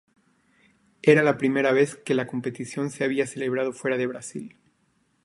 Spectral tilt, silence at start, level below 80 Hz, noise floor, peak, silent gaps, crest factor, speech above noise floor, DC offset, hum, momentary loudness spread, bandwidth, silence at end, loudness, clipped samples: -5.5 dB/octave; 1.05 s; -70 dBFS; -68 dBFS; -6 dBFS; none; 20 dB; 44 dB; under 0.1%; none; 14 LU; 11.5 kHz; 0.75 s; -24 LUFS; under 0.1%